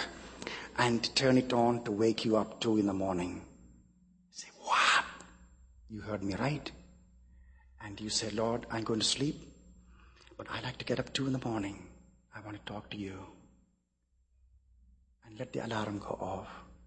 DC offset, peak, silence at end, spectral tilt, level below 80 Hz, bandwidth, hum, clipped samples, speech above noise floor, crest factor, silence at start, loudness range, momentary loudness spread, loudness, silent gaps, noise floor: under 0.1%; -12 dBFS; 0 s; -4 dB/octave; -60 dBFS; 8.4 kHz; none; under 0.1%; 43 dB; 24 dB; 0 s; 13 LU; 20 LU; -33 LUFS; none; -76 dBFS